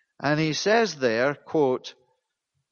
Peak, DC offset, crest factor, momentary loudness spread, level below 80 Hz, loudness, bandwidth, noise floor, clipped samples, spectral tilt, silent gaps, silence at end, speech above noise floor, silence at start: -8 dBFS; under 0.1%; 16 dB; 6 LU; -68 dBFS; -24 LUFS; 7.2 kHz; -79 dBFS; under 0.1%; -4.5 dB/octave; none; 0.8 s; 55 dB; 0.2 s